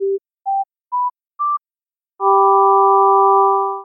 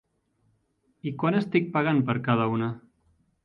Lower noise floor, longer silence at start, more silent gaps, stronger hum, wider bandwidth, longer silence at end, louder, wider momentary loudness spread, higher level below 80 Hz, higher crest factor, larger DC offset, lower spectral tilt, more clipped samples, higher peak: first, under -90 dBFS vs -70 dBFS; second, 0 s vs 1.05 s; neither; neither; second, 1.3 kHz vs 5.8 kHz; second, 0 s vs 0.65 s; first, -15 LUFS vs -26 LUFS; about the same, 13 LU vs 12 LU; second, under -90 dBFS vs -66 dBFS; second, 12 dB vs 20 dB; neither; first, -12 dB/octave vs -9.5 dB/octave; neither; first, -2 dBFS vs -8 dBFS